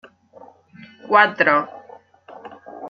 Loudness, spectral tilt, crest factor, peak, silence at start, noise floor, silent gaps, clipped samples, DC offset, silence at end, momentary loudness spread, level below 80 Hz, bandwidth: -16 LUFS; -6 dB/octave; 22 dB; -2 dBFS; 1.05 s; -47 dBFS; none; under 0.1%; under 0.1%; 0 s; 25 LU; -72 dBFS; 6.6 kHz